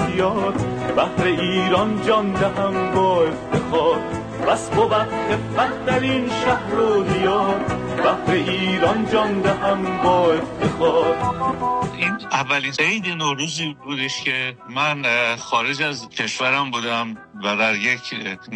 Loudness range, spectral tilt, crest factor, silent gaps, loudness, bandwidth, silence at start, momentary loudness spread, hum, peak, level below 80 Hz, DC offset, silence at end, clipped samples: 2 LU; -5 dB/octave; 16 dB; none; -20 LUFS; 11 kHz; 0 s; 6 LU; none; -4 dBFS; -46 dBFS; under 0.1%; 0 s; under 0.1%